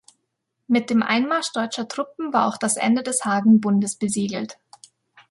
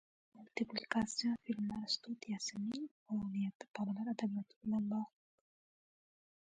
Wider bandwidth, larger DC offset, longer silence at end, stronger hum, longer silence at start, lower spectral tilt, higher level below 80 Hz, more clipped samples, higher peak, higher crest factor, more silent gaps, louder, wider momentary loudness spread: first, 11.5 kHz vs 9.4 kHz; neither; second, 0.75 s vs 1.4 s; neither; first, 0.7 s vs 0.35 s; about the same, -4 dB/octave vs -4.5 dB/octave; first, -68 dBFS vs -74 dBFS; neither; first, -6 dBFS vs -20 dBFS; second, 16 dB vs 22 dB; second, none vs 2.91-3.06 s, 3.55-3.60 s, 3.70-3.74 s, 4.56-4.61 s; first, -21 LUFS vs -41 LUFS; first, 11 LU vs 6 LU